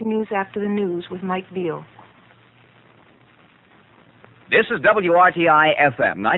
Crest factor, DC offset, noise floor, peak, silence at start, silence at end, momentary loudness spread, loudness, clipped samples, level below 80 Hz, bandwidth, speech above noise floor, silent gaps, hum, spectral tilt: 18 dB; under 0.1%; -53 dBFS; -2 dBFS; 0 s; 0 s; 13 LU; -18 LUFS; under 0.1%; -62 dBFS; 4.2 kHz; 35 dB; none; none; -8 dB/octave